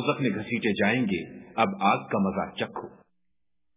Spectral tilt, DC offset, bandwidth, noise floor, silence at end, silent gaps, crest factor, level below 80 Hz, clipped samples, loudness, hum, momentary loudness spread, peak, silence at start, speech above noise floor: -4.5 dB/octave; under 0.1%; 3.9 kHz; -84 dBFS; 0.85 s; none; 22 dB; -60 dBFS; under 0.1%; -27 LUFS; none; 10 LU; -6 dBFS; 0 s; 57 dB